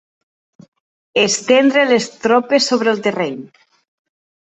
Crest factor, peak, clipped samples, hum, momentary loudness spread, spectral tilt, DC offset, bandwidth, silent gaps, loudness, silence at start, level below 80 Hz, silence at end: 16 dB; -2 dBFS; under 0.1%; none; 10 LU; -3 dB/octave; under 0.1%; 8.4 kHz; none; -15 LUFS; 1.15 s; -64 dBFS; 1.05 s